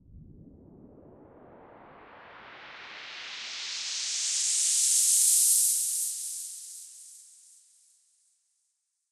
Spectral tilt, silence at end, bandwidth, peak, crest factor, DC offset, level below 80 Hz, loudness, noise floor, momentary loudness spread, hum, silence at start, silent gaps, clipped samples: 2.5 dB/octave; 1.9 s; 16 kHz; -10 dBFS; 22 dB; under 0.1%; -68 dBFS; -24 LUFS; -79 dBFS; 26 LU; none; 0.1 s; none; under 0.1%